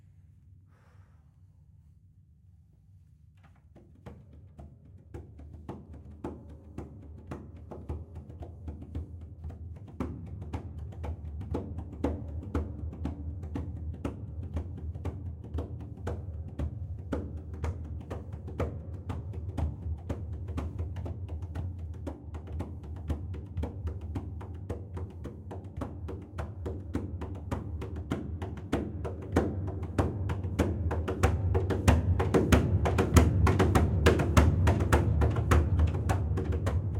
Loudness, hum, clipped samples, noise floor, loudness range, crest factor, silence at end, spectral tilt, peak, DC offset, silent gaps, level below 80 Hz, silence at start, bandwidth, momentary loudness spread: -32 LUFS; none; under 0.1%; -59 dBFS; 19 LU; 26 dB; 0 s; -7 dB/octave; -6 dBFS; under 0.1%; none; -40 dBFS; 0.3 s; 16 kHz; 20 LU